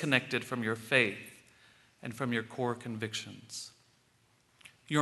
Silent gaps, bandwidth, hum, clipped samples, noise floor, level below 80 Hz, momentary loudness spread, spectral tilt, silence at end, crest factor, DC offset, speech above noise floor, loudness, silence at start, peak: none; 12 kHz; none; under 0.1%; -69 dBFS; -76 dBFS; 18 LU; -4.5 dB/octave; 0 s; 26 dB; under 0.1%; 35 dB; -33 LUFS; 0 s; -8 dBFS